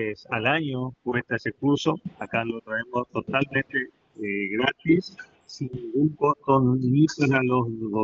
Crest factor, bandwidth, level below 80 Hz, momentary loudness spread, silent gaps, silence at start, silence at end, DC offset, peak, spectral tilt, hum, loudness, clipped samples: 18 dB; 7.6 kHz; -60 dBFS; 11 LU; none; 0 s; 0 s; under 0.1%; -6 dBFS; -5 dB/octave; none; -25 LUFS; under 0.1%